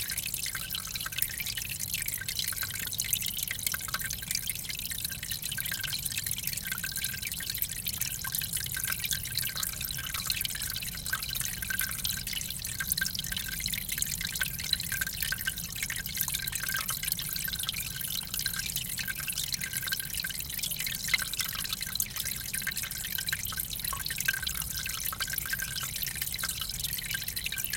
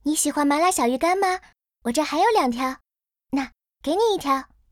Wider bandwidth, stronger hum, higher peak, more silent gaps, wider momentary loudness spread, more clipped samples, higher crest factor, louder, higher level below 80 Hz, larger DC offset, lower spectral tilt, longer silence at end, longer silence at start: about the same, 17 kHz vs 18 kHz; neither; about the same, -8 dBFS vs -8 dBFS; neither; second, 3 LU vs 11 LU; neither; first, 26 dB vs 14 dB; second, -31 LUFS vs -22 LUFS; first, -50 dBFS vs -56 dBFS; neither; second, -0.5 dB/octave vs -2 dB/octave; second, 0 s vs 0.25 s; about the same, 0 s vs 0.05 s